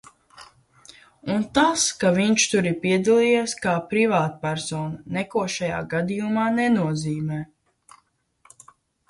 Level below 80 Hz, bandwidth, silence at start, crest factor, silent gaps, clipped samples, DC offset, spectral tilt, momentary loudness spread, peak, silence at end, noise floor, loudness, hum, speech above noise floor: -58 dBFS; 11.5 kHz; 0.35 s; 20 dB; none; under 0.1%; under 0.1%; -4.5 dB/octave; 10 LU; -4 dBFS; 1.65 s; -65 dBFS; -22 LUFS; none; 43 dB